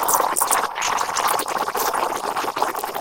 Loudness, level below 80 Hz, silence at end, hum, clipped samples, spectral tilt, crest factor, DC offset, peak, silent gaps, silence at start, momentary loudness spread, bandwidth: -21 LUFS; -58 dBFS; 0 s; none; under 0.1%; -0.5 dB/octave; 20 dB; under 0.1%; -2 dBFS; none; 0 s; 6 LU; 17.5 kHz